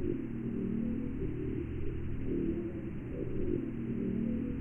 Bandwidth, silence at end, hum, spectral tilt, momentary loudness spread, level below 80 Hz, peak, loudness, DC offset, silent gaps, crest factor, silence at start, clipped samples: 3.3 kHz; 0 s; none; -11 dB/octave; 5 LU; -44 dBFS; -20 dBFS; -37 LUFS; under 0.1%; none; 14 dB; 0 s; under 0.1%